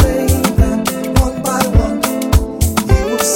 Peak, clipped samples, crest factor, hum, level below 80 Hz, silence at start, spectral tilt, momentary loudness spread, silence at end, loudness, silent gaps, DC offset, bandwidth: 0 dBFS; under 0.1%; 14 dB; none; -18 dBFS; 0 s; -5 dB/octave; 3 LU; 0 s; -15 LUFS; none; 0.1%; 17 kHz